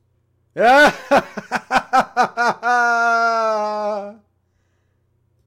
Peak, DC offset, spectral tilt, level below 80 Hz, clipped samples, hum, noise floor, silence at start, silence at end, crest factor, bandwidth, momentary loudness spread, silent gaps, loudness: -4 dBFS; under 0.1%; -3.5 dB/octave; -54 dBFS; under 0.1%; none; -64 dBFS; 0.55 s; 1.35 s; 14 dB; 16 kHz; 14 LU; none; -17 LUFS